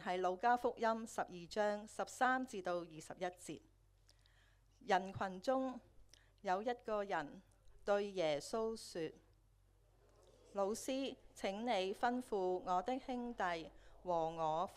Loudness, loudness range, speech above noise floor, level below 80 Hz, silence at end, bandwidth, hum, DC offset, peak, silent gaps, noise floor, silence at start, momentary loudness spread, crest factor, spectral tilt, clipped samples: -41 LUFS; 4 LU; 31 dB; -70 dBFS; 0 s; 15 kHz; none; under 0.1%; -20 dBFS; none; -71 dBFS; 0 s; 12 LU; 22 dB; -4.5 dB/octave; under 0.1%